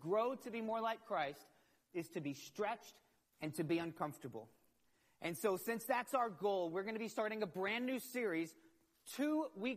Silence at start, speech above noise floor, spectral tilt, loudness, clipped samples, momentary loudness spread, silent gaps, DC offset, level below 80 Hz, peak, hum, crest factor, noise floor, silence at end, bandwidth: 0 s; 37 dB; -5 dB/octave; -41 LUFS; under 0.1%; 11 LU; none; under 0.1%; -86 dBFS; -24 dBFS; none; 18 dB; -78 dBFS; 0 s; 15 kHz